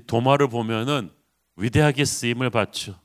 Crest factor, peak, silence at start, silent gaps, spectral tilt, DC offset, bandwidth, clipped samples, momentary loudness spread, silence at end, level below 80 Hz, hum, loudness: 20 dB; -2 dBFS; 0.1 s; none; -5 dB/octave; under 0.1%; 16 kHz; under 0.1%; 8 LU; 0.1 s; -48 dBFS; none; -22 LUFS